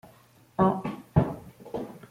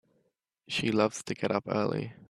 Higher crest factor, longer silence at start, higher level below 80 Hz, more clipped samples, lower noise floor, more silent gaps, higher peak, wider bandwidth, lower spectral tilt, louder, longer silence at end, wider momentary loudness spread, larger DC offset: about the same, 22 dB vs 20 dB; about the same, 0.6 s vs 0.7 s; first, -50 dBFS vs -70 dBFS; neither; second, -57 dBFS vs -76 dBFS; neither; first, -8 dBFS vs -12 dBFS; first, 15.5 kHz vs 13 kHz; first, -9.5 dB/octave vs -5 dB/octave; about the same, -29 LUFS vs -30 LUFS; about the same, 0.15 s vs 0.15 s; first, 13 LU vs 6 LU; neither